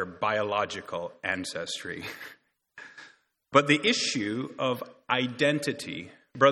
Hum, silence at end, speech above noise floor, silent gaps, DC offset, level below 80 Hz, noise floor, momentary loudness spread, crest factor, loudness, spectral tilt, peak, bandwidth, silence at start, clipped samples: none; 0 s; 28 dB; none; under 0.1%; -70 dBFS; -56 dBFS; 21 LU; 24 dB; -28 LUFS; -4 dB/octave; -4 dBFS; 16 kHz; 0 s; under 0.1%